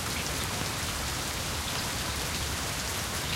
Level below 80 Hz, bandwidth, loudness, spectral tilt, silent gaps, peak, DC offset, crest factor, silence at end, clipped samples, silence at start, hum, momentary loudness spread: -42 dBFS; 17 kHz; -31 LUFS; -2.5 dB/octave; none; -14 dBFS; under 0.1%; 18 dB; 0 s; under 0.1%; 0 s; none; 1 LU